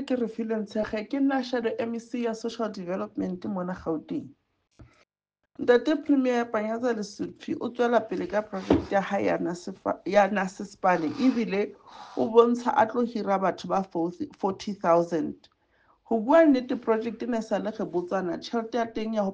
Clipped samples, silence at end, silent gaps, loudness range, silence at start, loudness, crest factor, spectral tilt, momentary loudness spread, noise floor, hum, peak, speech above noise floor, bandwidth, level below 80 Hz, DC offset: under 0.1%; 0 s; none; 5 LU; 0 s; -27 LUFS; 22 dB; -6.5 dB/octave; 10 LU; -83 dBFS; none; -6 dBFS; 56 dB; 9 kHz; -58 dBFS; under 0.1%